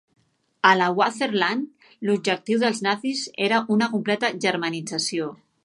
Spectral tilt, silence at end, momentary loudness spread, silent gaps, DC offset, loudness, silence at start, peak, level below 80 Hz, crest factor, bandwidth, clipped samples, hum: -4 dB/octave; 0.3 s; 9 LU; none; under 0.1%; -23 LUFS; 0.65 s; -2 dBFS; -74 dBFS; 22 dB; 11.5 kHz; under 0.1%; none